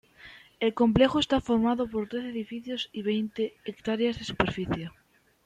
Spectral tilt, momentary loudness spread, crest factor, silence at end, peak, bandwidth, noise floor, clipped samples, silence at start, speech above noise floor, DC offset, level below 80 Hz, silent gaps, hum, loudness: -6 dB/octave; 12 LU; 20 dB; 0.55 s; -8 dBFS; 9.2 kHz; -52 dBFS; under 0.1%; 0.25 s; 24 dB; under 0.1%; -52 dBFS; none; none; -28 LUFS